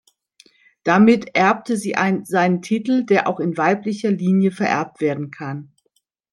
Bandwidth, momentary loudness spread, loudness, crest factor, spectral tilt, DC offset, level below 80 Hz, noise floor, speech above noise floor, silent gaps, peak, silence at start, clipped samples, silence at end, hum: 12.5 kHz; 12 LU; -19 LUFS; 18 dB; -6.5 dB/octave; under 0.1%; -64 dBFS; -68 dBFS; 50 dB; none; -2 dBFS; 0.85 s; under 0.1%; 0.7 s; none